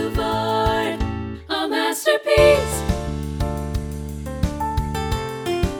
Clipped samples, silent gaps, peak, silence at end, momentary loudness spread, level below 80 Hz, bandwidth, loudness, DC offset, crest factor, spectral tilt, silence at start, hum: under 0.1%; none; -2 dBFS; 0 s; 12 LU; -30 dBFS; over 20 kHz; -21 LUFS; under 0.1%; 20 dB; -5 dB/octave; 0 s; none